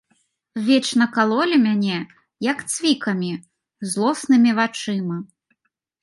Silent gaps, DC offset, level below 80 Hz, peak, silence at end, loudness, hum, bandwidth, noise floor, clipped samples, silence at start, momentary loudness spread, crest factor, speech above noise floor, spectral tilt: none; under 0.1%; -70 dBFS; -4 dBFS; 0.8 s; -20 LUFS; none; 11.5 kHz; -74 dBFS; under 0.1%; 0.55 s; 13 LU; 18 dB; 54 dB; -4.5 dB/octave